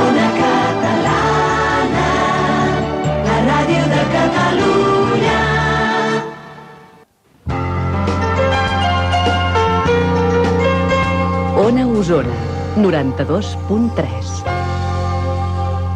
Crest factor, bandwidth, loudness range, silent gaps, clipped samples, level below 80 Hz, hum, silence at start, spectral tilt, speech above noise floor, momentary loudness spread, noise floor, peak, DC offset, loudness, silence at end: 12 dB; 10 kHz; 4 LU; none; under 0.1%; -32 dBFS; none; 0 s; -6 dB/octave; 33 dB; 6 LU; -49 dBFS; -4 dBFS; under 0.1%; -16 LUFS; 0 s